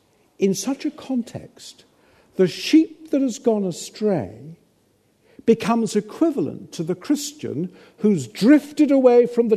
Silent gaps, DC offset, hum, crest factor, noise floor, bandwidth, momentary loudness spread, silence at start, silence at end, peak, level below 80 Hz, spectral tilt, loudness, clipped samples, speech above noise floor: none; under 0.1%; none; 18 dB; -62 dBFS; 13.5 kHz; 15 LU; 0.4 s; 0 s; -2 dBFS; -68 dBFS; -5.5 dB/octave; -20 LUFS; under 0.1%; 42 dB